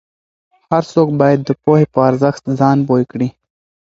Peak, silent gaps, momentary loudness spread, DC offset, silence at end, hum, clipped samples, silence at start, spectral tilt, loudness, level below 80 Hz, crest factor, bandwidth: 0 dBFS; none; 6 LU; under 0.1%; 0.55 s; none; under 0.1%; 0.7 s; -8.5 dB/octave; -14 LUFS; -54 dBFS; 14 dB; 7.8 kHz